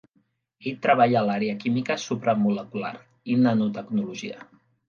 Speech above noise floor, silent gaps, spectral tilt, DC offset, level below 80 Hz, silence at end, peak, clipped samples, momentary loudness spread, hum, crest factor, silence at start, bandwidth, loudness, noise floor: 45 dB; none; -6.5 dB/octave; under 0.1%; -70 dBFS; 0.45 s; -6 dBFS; under 0.1%; 15 LU; none; 20 dB; 0.6 s; 7.2 kHz; -24 LUFS; -69 dBFS